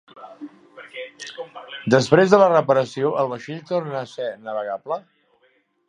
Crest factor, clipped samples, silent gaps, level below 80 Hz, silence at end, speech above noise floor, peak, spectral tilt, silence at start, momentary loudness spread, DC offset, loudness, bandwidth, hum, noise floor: 22 dB; under 0.1%; none; -66 dBFS; 0.9 s; 43 dB; 0 dBFS; -6 dB/octave; 0.15 s; 22 LU; under 0.1%; -20 LUFS; 10.5 kHz; none; -63 dBFS